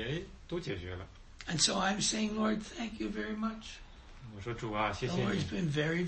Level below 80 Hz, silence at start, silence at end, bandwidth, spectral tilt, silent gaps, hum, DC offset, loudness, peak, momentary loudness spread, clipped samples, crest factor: -52 dBFS; 0 s; 0 s; 8.4 kHz; -4 dB/octave; none; none; under 0.1%; -34 LUFS; -14 dBFS; 17 LU; under 0.1%; 22 dB